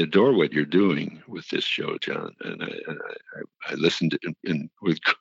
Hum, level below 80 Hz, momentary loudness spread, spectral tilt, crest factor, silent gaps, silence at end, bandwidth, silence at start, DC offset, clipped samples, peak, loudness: none; -70 dBFS; 15 LU; -6 dB/octave; 20 dB; none; 0.05 s; 7.8 kHz; 0 s; under 0.1%; under 0.1%; -6 dBFS; -25 LUFS